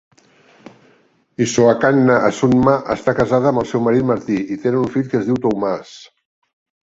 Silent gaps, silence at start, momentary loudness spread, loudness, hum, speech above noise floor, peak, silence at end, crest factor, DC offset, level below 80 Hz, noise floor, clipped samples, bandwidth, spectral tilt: none; 1.4 s; 8 LU; -16 LUFS; none; 40 dB; -2 dBFS; 0.8 s; 16 dB; under 0.1%; -48 dBFS; -55 dBFS; under 0.1%; 8 kHz; -6.5 dB/octave